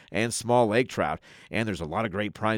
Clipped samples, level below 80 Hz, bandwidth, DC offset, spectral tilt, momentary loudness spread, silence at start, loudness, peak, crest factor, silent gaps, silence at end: under 0.1%; -58 dBFS; 18.5 kHz; under 0.1%; -5 dB/octave; 8 LU; 0.1 s; -27 LUFS; -10 dBFS; 18 dB; none; 0 s